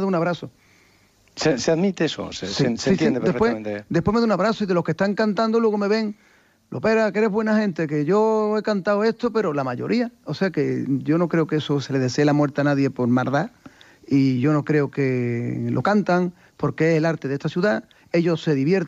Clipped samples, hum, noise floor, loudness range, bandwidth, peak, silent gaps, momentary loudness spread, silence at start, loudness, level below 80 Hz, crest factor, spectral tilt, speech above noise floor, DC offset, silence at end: under 0.1%; none; -57 dBFS; 1 LU; 8 kHz; -8 dBFS; none; 6 LU; 0 s; -22 LUFS; -56 dBFS; 14 dB; -6.5 dB/octave; 37 dB; under 0.1%; 0 s